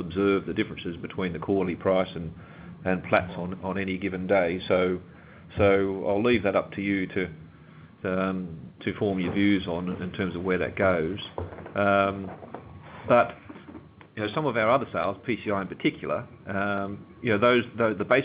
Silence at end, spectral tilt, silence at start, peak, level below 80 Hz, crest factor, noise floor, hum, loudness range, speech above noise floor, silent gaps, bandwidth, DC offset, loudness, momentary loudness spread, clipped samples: 0 s; -10 dB/octave; 0 s; -6 dBFS; -50 dBFS; 22 dB; -49 dBFS; none; 3 LU; 23 dB; none; 4 kHz; under 0.1%; -27 LUFS; 15 LU; under 0.1%